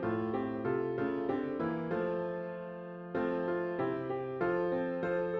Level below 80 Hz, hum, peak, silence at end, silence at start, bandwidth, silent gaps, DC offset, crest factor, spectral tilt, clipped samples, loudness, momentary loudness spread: -66 dBFS; none; -20 dBFS; 0 s; 0 s; 5.6 kHz; none; under 0.1%; 14 dB; -9.5 dB/octave; under 0.1%; -35 LUFS; 6 LU